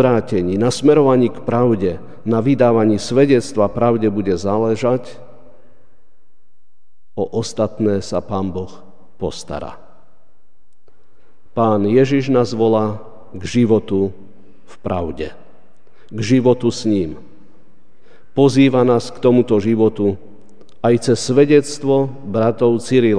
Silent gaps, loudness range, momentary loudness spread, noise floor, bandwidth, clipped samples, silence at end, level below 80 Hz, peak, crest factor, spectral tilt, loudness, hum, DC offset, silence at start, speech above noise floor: none; 9 LU; 15 LU; -64 dBFS; 10 kHz; under 0.1%; 0 s; -50 dBFS; 0 dBFS; 16 dB; -6.5 dB/octave; -16 LUFS; none; 3%; 0 s; 48 dB